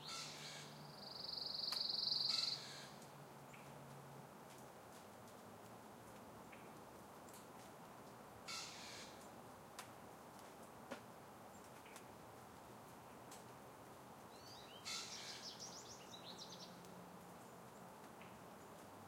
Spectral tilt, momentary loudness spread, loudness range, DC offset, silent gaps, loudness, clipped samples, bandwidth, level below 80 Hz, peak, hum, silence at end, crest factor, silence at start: -2 dB/octave; 16 LU; 15 LU; under 0.1%; none; -50 LUFS; under 0.1%; 16 kHz; -82 dBFS; -28 dBFS; none; 0 s; 24 dB; 0 s